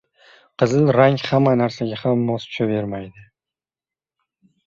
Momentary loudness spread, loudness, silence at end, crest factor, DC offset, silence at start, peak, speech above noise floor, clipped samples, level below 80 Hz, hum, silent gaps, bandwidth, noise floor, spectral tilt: 11 LU; -19 LUFS; 1.45 s; 18 dB; under 0.1%; 0.6 s; -2 dBFS; over 72 dB; under 0.1%; -58 dBFS; none; none; 7.4 kHz; under -90 dBFS; -7.5 dB/octave